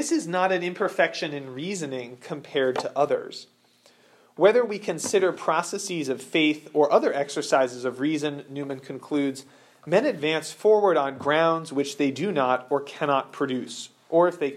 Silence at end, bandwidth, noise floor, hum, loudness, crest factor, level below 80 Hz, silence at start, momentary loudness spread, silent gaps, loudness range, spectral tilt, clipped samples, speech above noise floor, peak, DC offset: 0 s; 14.5 kHz; -59 dBFS; none; -25 LUFS; 20 dB; -82 dBFS; 0 s; 13 LU; none; 4 LU; -4.5 dB/octave; under 0.1%; 35 dB; -6 dBFS; under 0.1%